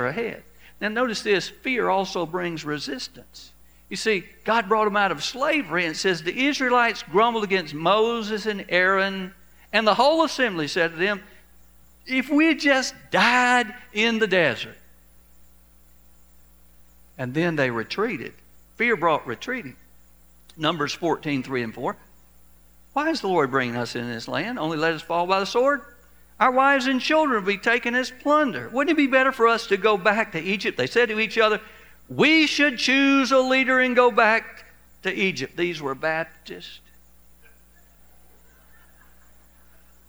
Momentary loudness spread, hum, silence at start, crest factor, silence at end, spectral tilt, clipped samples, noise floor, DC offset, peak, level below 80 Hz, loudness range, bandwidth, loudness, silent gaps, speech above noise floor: 12 LU; none; 0 s; 20 dB; 3.3 s; -4 dB/octave; under 0.1%; -55 dBFS; 0.2%; -2 dBFS; -58 dBFS; 9 LU; over 20 kHz; -22 LUFS; none; 33 dB